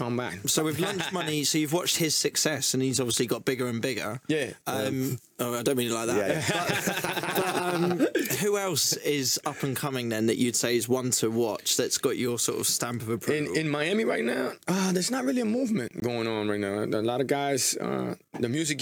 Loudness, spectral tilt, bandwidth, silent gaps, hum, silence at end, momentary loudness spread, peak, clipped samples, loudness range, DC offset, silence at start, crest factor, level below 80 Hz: -27 LUFS; -3.5 dB/octave; over 20 kHz; none; none; 0 s; 6 LU; -10 dBFS; under 0.1%; 2 LU; under 0.1%; 0 s; 18 dB; -70 dBFS